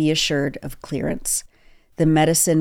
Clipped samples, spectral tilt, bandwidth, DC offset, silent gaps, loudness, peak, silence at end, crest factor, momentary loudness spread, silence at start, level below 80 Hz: under 0.1%; -4 dB/octave; 17.5 kHz; under 0.1%; none; -20 LUFS; -6 dBFS; 0 s; 14 dB; 11 LU; 0 s; -42 dBFS